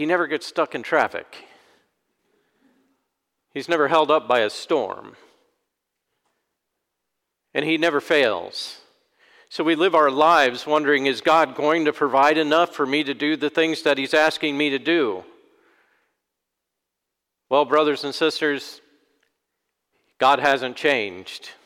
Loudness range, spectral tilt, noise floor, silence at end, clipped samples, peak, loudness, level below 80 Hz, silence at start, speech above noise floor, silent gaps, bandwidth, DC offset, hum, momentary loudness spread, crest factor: 8 LU; -4 dB/octave; -82 dBFS; 0.15 s; under 0.1%; -6 dBFS; -20 LUFS; -72 dBFS; 0 s; 62 dB; none; 16 kHz; under 0.1%; none; 13 LU; 18 dB